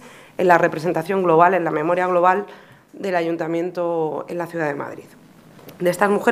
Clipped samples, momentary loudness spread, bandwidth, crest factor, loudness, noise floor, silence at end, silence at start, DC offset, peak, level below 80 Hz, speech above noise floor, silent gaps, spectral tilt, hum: under 0.1%; 14 LU; 15.5 kHz; 20 dB; -20 LUFS; -45 dBFS; 0 s; 0 s; under 0.1%; 0 dBFS; -70 dBFS; 26 dB; none; -6.5 dB/octave; none